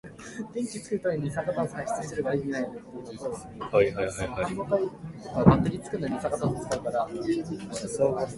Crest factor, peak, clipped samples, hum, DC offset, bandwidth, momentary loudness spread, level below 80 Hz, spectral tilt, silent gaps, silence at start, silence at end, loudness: 26 dB; -2 dBFS; under 0.1%; none; under 0.1%; 11.5 kHz; 12 LU; -50 dBFS; -6.5 dB/octave; none; 0.05 s; 0 s; -29 LUFS